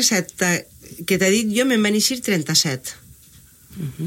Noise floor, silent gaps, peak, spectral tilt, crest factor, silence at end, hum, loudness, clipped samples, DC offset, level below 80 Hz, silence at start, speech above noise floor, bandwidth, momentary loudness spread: -48 dBFS; none; -4 dBFS; -3 dB/octave; 18 dB; 0 s; none; -19 LUFS; under 0.1%; under 0.1%; -56 dBFS; 0 s; 29 dB; 17 kHz; 15 LU